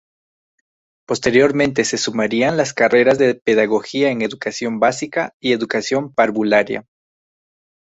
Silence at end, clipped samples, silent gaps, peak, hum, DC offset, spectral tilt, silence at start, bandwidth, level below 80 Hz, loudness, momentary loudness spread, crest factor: 1.1 s; under 0.1%; 3.42-3.46 s, 5.33-5.40 s; -2 dBFS; none; under 0.1%; -4 dB/octave; 1.1 s; 8.2 kHz; -58 dBFS; -17 LUFS; 9 LU; 16 dB